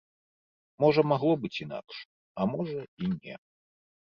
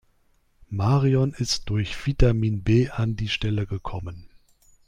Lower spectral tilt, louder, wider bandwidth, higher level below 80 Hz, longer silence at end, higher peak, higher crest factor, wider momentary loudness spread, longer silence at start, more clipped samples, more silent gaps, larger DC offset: first, -8.5 dB/octave vs -6 dB/octave; second, -29 LUFS vs -24 LUFS; second, 7 kHz vs 11 kHz; second, -66 dBFS vs -34 dBFS; first, 0.75 s vs 0.6 s; second, -10 dBFS vs -6 dBFS; about the same, 20 dB vs 18 dB; first, 20 LU vs 12 LU; about the same, 0.8 s vs 0.7 s; neither; first, 2.05-2.35 s, 2.88-2.97 s vs none; neither